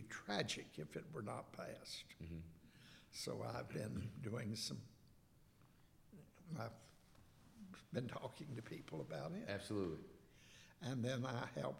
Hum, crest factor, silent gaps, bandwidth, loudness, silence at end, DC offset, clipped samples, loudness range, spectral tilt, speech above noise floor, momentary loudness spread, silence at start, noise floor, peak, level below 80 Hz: none; 26 dB; none; 16.5 kHz; -48 LUFS; 0 s; under 0.1%; under 0.1%; 6 LU; -5 dB/octave; 22 dB; 20 LU; 0 s; -69 dBFS; -24 dBFS; -72 dBFS